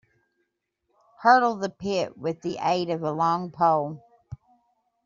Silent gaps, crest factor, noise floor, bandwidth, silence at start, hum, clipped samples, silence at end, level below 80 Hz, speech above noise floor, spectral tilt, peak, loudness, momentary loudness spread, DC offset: none; 22 dB; -77 dBFS; 7.4 kHz; 1.2 s; none; under 0.1%; 0.7 s; -66 dBFS; 53 dB; -4 dB/octave; -4 dBFS; -24 LUFS; 25 LU; under 0.1%